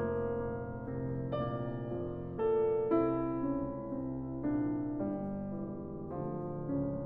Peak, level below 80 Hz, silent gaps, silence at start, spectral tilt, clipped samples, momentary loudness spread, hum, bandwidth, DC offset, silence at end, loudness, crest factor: -18 dBFS; -54 dBFS; none; 0 s; -11.5 dB/octave; under 0.1%; 9 LU; none; 3.9 kHz; under 0.1%; 0 s; -36 LUFS; 16 dB